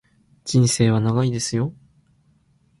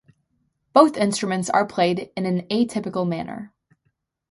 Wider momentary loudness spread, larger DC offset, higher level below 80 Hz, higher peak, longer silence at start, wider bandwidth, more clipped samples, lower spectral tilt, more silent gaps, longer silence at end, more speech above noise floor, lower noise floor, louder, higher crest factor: second, 10 LU vs 13 LU; neither; first, -52 dBFS vs -64 dBFS; second, -4 dBFS vs 0 dBFS; second, 0.45 s vs 0.75 s; about the same, 11.5 kHz vs 11.5 kHz; neither; about the same, -5.5 dB/octave vs -5.5 dB/octave; neither; first, 1.1 s vs 0.85 s; second, 41 dB vs 51 dB; second, -60 dBFS vs -72 dBFS; about the same, -20 LUFS vs -21 LUFS; about the same, 18 dB vs 22 dB